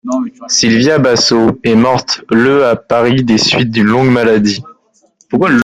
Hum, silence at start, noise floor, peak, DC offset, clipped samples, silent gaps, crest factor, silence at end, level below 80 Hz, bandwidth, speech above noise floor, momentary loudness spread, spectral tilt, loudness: none; 0.05 s; -52 dBFS; 0 dBFS; under 0.1%; under 0.1%; none; 10 dB; 0 s; -46 dBFS; 9.6 kHz; 42 dB; 6 LU; -4.5 dB/octave; -10 LUFS